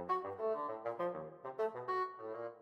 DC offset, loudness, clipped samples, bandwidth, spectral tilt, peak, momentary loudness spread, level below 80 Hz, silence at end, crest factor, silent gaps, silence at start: under 0.1%; -41 LUFS; under 0.1%; 8.2 kHz; -7 dB/octave; -24 dBFS; 8 LU; -84 dBFS; 0 s; 16 dB; none; 0 s